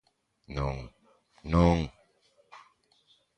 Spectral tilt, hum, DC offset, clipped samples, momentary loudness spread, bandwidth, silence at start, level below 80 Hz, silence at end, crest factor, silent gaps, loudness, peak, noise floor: -8 dB/octave; none; under 0.1%; under 0.1%; 21 LU; 8.6 kHz; 0.5 s; -42 dBFS; 0.8 s; 24 dB; none; -29 LUFS; -8 dBFS; -67 dBFS